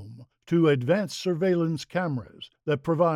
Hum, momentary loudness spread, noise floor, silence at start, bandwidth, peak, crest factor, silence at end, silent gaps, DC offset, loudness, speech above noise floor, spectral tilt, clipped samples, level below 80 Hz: none; 13 LU; -46 dBFS; 0 s; 13 kHz; -10 dBFS; 16 dB; 0 s; none; under 0.1%; -26 LUFS; 21 dB; -7 dB/octave; under 0.1%; -66 dBFS